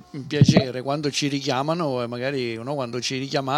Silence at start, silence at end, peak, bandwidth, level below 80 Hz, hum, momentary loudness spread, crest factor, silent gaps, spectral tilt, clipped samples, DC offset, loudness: 0.15 s; 0 s; -4 dBFS; 13 kHz; -54 dBFS; none; 10 LU; 20 dB; none; -5.5 dB/octave; under 0.1%; under 0.1%; -23 LUFS